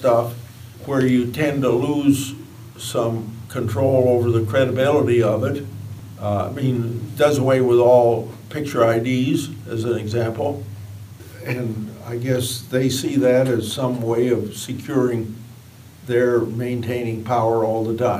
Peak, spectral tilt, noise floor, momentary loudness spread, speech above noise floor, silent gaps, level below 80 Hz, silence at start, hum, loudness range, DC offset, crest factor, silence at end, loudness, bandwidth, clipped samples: -2 dBFS; -6.5 dB/octave; -43 dBFS; 15 LU; 24 dB; none; -58 dBFS; 0 s; none; 5 LU; under 0.1%; 18 dB; 0 s; -20 LUFS; 15.5 kHz; under 0.1%